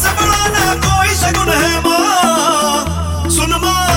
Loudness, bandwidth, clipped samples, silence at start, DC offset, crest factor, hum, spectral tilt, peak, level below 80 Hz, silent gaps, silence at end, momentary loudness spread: -12 LUFS; 16.5 kHz; under 0.1%; 0 s; under 0.1%; 12 dB; none; -3 dB/octave; 0 dBFS; -24 dBFS; none; 0 s; 4 LU